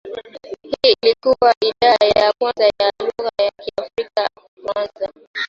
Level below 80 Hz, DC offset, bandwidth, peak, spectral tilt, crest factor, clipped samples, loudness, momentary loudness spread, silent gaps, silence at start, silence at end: -54 dBFS; under 0.1%; 7.6 kHz; 0 dBFS; -3.5 dB/octave; 18 dB; under 0.1%; -17 LUFS; 15 LU; 1.57-1.61 s, 4.48-4.57 s, 5.27-5.34 s; 0.05 s; 0 s